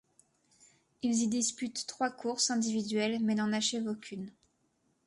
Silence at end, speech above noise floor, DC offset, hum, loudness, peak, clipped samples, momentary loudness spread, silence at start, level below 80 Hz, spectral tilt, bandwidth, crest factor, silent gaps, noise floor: 0.75 s; 43 dB; under 0.1%; none; -32 LUFS; -16 dBFS; under 0.1%; 10 LU; 1.05 s; -76 dBFS; -3 dB/octave; 11.5 kHz; 18 dB; none; -75 dBFS